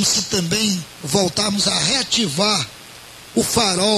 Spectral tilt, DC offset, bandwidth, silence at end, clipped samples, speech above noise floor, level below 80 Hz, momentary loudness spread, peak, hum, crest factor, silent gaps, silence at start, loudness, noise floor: -2.5 dB/octave; under 0.1%; 14.5 kHz; 0 s; under 0.1%; 21 dB; -48 dBFS; 11 LU; -2 dBFS; none; 18 dB; none; 0 s; -18 LUFS; -40 dBFS